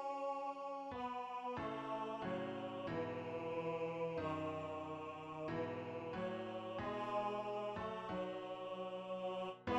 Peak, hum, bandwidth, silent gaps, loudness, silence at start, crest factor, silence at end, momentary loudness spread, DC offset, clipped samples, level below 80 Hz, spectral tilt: -26 dBFS; none; 11 kHz; none; -44 LUFS; 0 s; 16 dB; 0 s; 4 LU; under 0.1%; under 0.1%; -72 dBFS; -7 dB/octave